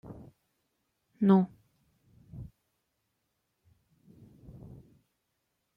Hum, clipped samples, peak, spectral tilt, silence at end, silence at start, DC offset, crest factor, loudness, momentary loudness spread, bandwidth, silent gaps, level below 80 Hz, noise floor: none; under 0.1%; -12 dBFS; -10.5 dB/octave; 3.35 s; 0.1 s; under 0.1%; 22 dB; -27 LUFS; 27 LU; 4.1 kHz; none; -64 dBFS; -81 dBFS